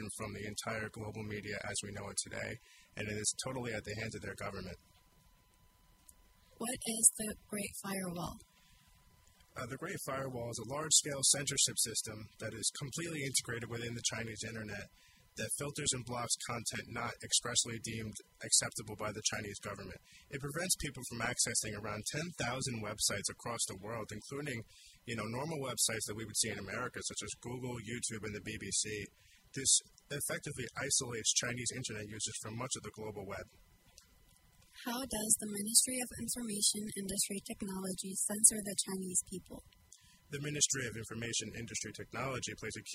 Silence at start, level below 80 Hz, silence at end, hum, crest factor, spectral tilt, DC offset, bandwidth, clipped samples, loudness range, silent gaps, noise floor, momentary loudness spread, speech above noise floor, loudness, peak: 0 s; -64 dBFS; 0 s; none; 30 dB; -2 dB/octave; under 0.1%; 16 kHz; under 0.1%; 8 LU; none; -67 dBFS; 16 LU; 29 dB; -36 LUFS; -8 dBFS